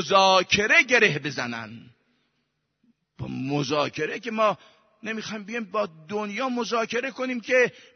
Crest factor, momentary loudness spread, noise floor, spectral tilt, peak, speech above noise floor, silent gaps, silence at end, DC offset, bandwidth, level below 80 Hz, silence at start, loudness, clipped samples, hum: 22 dB; 16 LU; -75 dBFS; -3.5 dB/octave; -4 dBFS; 51 dB; none; 0.25 s; under 0.1%; 6.6 kHz; -62 dBFS; 0 s; -23 LUFS; under 0.1%; none